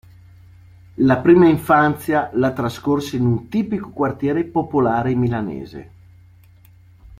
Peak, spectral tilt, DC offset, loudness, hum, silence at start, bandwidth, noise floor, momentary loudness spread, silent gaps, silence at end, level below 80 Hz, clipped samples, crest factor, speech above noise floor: -2 dBFS; -8 dB/octave; under 0.1%; -18 LUFS; none; 1 s; 16 kHz; -48 dBFS; 12 LU; none; 0.05 s; -48 dBFS; under 0.1%; 18 dB; 30 dB